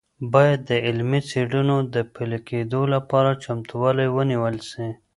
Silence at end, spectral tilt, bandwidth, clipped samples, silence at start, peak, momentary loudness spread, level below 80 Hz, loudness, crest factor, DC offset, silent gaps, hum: 0.25 s; -7 dB/octave; 11.5 kHz; under 0.1%; 0.2 s; -2 dBFS; 10 LU; -58 dBFS; -22 LUFS; 20 dB; under 0.1%; none; none